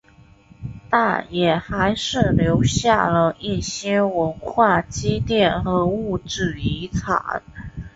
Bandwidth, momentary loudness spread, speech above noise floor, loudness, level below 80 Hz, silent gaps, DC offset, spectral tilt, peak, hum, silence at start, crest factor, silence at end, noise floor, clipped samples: 8 kHz; 9 LU; 30 dB; -20 LUFS; -38 dBFS; none; under 0.1%; -5.5 dB/octave; -2 dBFS; none; 0.6 s; 18 dB; 0.05 s; -49 dBFS; under 0.1%